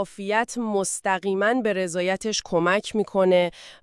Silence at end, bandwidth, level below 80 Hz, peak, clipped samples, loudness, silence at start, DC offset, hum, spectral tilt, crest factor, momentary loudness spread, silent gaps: 0.1 s; 12 kHz; -60 dBFS; -8 dBFS; under 0.1%; -23 LUFS; 0 s; under 0.1%; none; -4 dB/octave; 16 dB; 5 LU; none